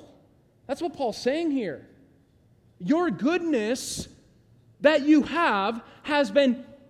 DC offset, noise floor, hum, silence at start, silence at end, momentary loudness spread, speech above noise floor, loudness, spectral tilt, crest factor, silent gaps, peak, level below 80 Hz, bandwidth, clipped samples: under 0.1%; -60 dBFS; none; 0 s; 0.15 s; 15 LU; 36 dB; -25 LUFS; -4.5 dB/octave; 20 dB; none; -8 dBFS; -60 dBFS; 13.5 kHz; under 0.1%